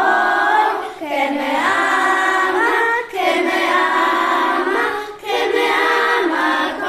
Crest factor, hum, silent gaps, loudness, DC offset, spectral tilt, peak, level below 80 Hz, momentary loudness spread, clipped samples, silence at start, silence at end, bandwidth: 14 dB; none; none; -16 LUFS; under 0.1%; -2 dB/octave; -2 dBFS; -58 dBFS; 5 LU; under 0.1%; 0 s; 0 s; 14.5 kHz